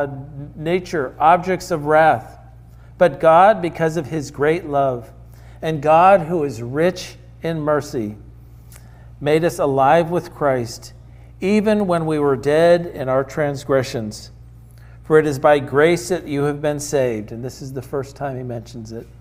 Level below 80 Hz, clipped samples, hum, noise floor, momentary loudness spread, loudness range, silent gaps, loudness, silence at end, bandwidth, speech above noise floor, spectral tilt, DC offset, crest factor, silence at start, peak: -46 dBFS; under 0.1%; none; -42 dBFS; 16 LU; 4 LU; none; -18 LUFS; 0.15 s; 16 kHz; 24 dB; -6 dB/octave; under 0.1%; 18 dB; 0 s; -2 dBFS